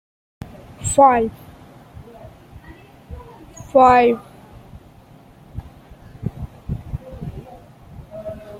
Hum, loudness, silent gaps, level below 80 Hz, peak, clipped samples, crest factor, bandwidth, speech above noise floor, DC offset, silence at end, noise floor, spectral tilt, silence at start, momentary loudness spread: none; -17 LUFS; none; -42 dBFS; -2 dBFS; under 0.1%; 20 dB; 16 kHz; 33 dB; under 0.1%; 0 s; -46 dBFS; -5.5 dB/octave; 0.8 s; 27 LU